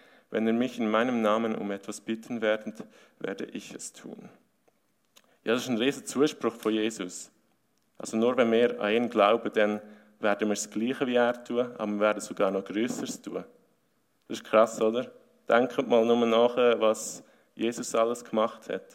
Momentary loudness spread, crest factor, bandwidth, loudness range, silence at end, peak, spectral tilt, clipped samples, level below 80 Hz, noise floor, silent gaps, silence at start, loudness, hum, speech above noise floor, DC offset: 16 LU; 20 dB; 16 kHz; 8 LU; 0.1 s; -8 dBFS; -4 dB/octave; under 0.1%; -80 dBFS; -72 dBFS; none; 0.3 s; -27 LUFS; none; 45 dB; under 0.1%